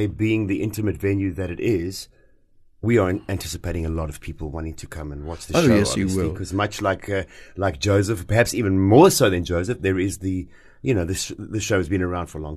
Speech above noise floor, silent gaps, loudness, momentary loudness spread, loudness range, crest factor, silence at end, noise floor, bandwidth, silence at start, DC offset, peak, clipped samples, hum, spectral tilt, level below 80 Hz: 32 dB; none; -22 LUFS; 15 LU; 6 LU; 20 dB; 0 s; -54 dBFS; 13 kHz; 0 s; under 0.1%; -2 dBFS; under 0.1%; none; -5.5 dB/octave; -40 dBFS